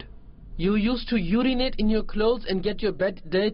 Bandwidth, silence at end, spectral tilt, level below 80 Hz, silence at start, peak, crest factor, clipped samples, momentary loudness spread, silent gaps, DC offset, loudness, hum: 5.6 kHz; 0 s; -10.5 dB/octave; -38 dBFS; 0 s; -12 dBFS; 12 dB; under 0.1%; 5 LU; none; under 0.1%; -25 LUFS; none